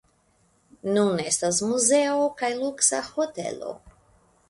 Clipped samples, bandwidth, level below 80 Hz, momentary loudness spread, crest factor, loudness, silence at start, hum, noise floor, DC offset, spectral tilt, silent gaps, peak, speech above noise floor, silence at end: under 0.1%; 11.5 kHz; -64 dBFS; 13 LU; 20 dB; -23 LUFS; 0.85 s; none; -65 dBFS; under 0.1%; -3 dB/octave; none; -6 dBFS; 40 dB; 0.6 s